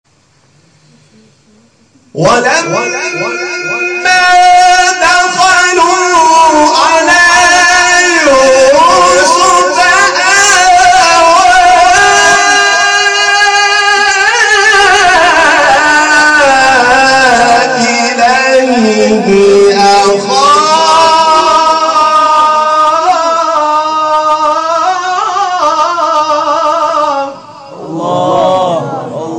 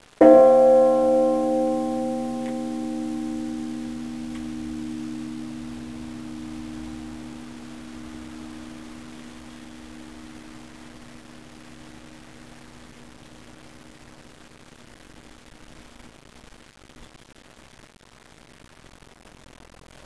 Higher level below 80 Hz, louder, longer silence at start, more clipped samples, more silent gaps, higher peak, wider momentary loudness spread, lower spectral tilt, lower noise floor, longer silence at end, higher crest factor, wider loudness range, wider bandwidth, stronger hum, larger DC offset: first, -40 dBFS vs -54 dBFS; first, -6 LUFS vs -22 LUFS; first, 2.15 s vs 0.2 s; first, 0.3% vs under 0.1%; neither; about the same, 0 dBFS vs -2 dBFS; second, 7 LU vs 29 LU; second, -1.5 dB/octave vs -6 dB/octave; about the same, -49 dBFS vs -49 dBFS; second, 0 s vs 3 s; second, 8 dB vs 24 dB; second, 6 LU vs 25 LU; about the same, 11 kHz vs 11 kHz; neither; second, under 0.1% vs 0.3%